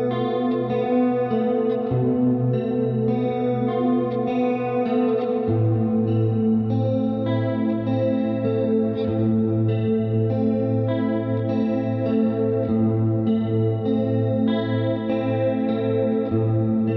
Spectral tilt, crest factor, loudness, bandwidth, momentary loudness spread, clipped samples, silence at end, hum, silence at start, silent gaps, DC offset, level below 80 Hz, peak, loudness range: -11 dB/octave; 12 dB; -22 LUFS; 4.8 kHz; 2 LU; under 0.1%; 0 s; none; 0 s; none; under 0.1%; -54 dBFS; -10 dBFS; 0 LU